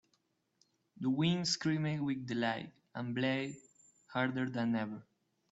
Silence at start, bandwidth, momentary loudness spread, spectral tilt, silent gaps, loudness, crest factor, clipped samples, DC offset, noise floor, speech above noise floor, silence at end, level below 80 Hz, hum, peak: 0.95 s; 8 kHz; 12 LU; -5 dB/octave; none; -36 LUFS; 18 dB; under 0.1%; under 0.1%; -79 dBFS; 44 dB; 0.5 s; -74 dBFS; none; -20 dBFS